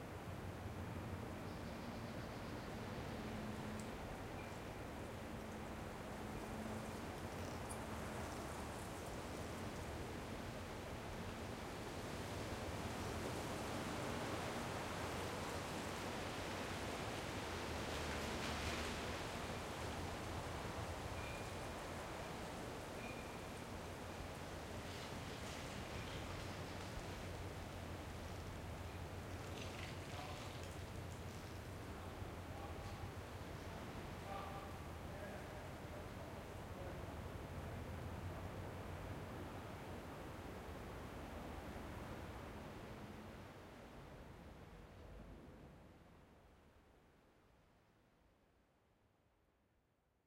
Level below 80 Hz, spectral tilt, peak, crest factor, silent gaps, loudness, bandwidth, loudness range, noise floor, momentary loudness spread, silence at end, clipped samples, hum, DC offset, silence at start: -58 dBFS; -5 dB/octave; -30 dBFS; 18 dB; none; -49 LUFS; 16 kHz; 8 LU; -80 dBFS; 7 LU; 1.95 s; under 0.1%; none; under 0.1%; 0 s